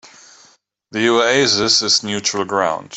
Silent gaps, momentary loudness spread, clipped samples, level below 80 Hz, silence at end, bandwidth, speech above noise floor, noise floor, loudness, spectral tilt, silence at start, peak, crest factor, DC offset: none; 7 LU; under 0.1%; -58 dBFS; 0 s; 8.4 kHz; 37 dB; -54 dBFS; -15 LUFS; -2 dB/octave; 0.9 s; -2 dBFS; 16 dB; under 0.1%